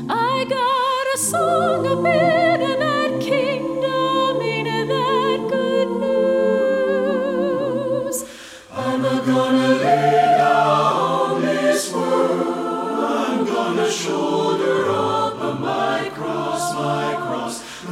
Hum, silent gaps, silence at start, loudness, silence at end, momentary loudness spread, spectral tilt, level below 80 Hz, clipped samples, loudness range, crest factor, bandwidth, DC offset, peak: none; none; 0 s; -19 LUFS; 0 s; 7 LU; -4.5 dB/octave; -60 dBFS; under 0.1%; 4 LU; 14 dB; 16 kHz; under 0.1%; -4 dBFS